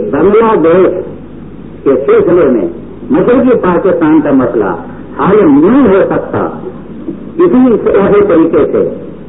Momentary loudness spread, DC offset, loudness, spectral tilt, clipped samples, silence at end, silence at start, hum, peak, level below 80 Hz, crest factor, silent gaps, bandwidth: 18 LU; 2%; -8 LUFS; -13.5 dB/octave; under 0.1%; 0 s; 0 s; none; 0 dBFS; -36 dBFS; 8 dB; none; 3.9 kHz